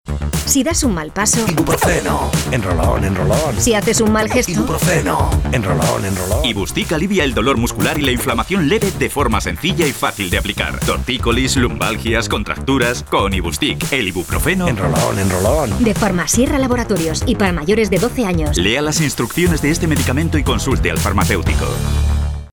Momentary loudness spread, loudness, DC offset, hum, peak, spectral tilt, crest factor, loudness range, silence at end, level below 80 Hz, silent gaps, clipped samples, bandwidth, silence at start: 4 LU; -16 LUFS; under 0.1%; none; -2 dBFS; -4.5 dB/octave; 14 dB; 2 LU; 0.05 s; -26 dBFS; none; under 0.1%; over 20 kHz; 0.05 s